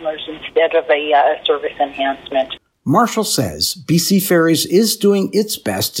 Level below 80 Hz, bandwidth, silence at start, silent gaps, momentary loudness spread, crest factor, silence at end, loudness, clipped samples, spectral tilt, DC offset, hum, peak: -54 dBFS; 17 kHz; 0 s; none; 7 LU; 16 dB; 0 s; -16 LUFS; under 0.1%; -4 dB/octave; under 0.1%; none; 0 dBFS